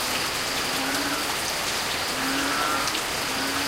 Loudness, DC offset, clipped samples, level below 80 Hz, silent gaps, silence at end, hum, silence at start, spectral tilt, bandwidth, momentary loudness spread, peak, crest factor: -24 LUFS; under 0.1%; under 0.1%; -50 dBFS; none; 0 s; none; 0 s; -1.5 dB/octave; 16.5 kHz; 2 LU; -10 dBFS; 16 dB